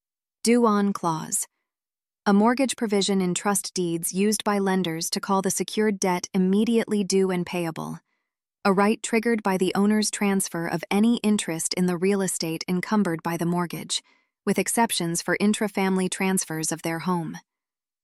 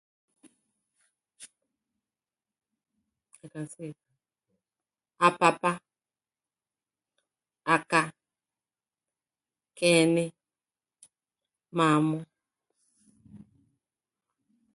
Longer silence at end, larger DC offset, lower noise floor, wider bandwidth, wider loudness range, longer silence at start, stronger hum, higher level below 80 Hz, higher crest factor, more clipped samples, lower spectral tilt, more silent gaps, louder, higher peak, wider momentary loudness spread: second, 0.65 s vs 1.4 s; neither; about the same, under -90 dBFS vs under -90 dBFS; first, 15 kHz vs 11.5 kHz; second, 2 LU vs 20 LU; second, 0.45 s vs 1.4 s; neither; first, -68 dBFS vs -78 dBFS; second, 16 dB vs 26 dB; neither; about the same, -4.5 dB/octave vs -4.5 dB/octave; neither; about the same, -24 LUFS vs -26 LUFS; about the same, -8 dBFS vs -6 dBFS; second, 7 LU vs 19 LU